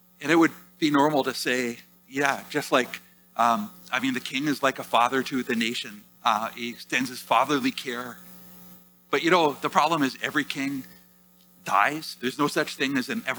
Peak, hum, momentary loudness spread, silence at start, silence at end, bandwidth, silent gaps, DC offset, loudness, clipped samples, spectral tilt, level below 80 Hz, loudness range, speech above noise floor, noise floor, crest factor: -4 dBFS; none; 13 LU; 0.2 s; 0 s; over 20 kHz; none; under 0.1%; -25 LUFS; under 0.1%; -4 dB/octave; -72 dBFS; 2 LU; 32 dB; -57 dBFS; 22 dB